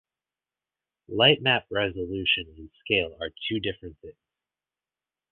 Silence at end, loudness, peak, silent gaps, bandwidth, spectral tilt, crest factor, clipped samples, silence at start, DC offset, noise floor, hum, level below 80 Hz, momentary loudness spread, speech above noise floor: 1.2 s; -25 LUFS; -4 dBFS; none; 4.4 kHz; -8.5 dB/octave; 24 dB; under 0.1%; 1.1 s; under 0.1%; under -90 dBFS; none; -54 dBFS; 22 LU; over 63 dB